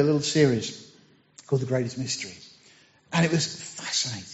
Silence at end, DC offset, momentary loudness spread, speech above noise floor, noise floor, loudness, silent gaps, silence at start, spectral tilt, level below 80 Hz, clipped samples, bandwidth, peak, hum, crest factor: 0 s; under 0.1%; 14 LU; 32 dB; -57 dBFS; -26 LUFS; none; 0 s; -5 dB/octave; -64 dBFS; under 0.1%; 8 kHz; -8 dBFS; none; 20 dB